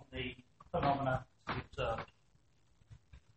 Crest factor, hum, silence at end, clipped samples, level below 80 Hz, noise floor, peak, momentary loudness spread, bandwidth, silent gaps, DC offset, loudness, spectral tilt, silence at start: 20 dB; none; 0.2 s; under 0.1%; -56 dBFS; -72 dBFS; -20 dBFS; 11 LU; 8.4 kHz; none; under 0.1%; -39 LUFS; -7 dB/octave; 0 s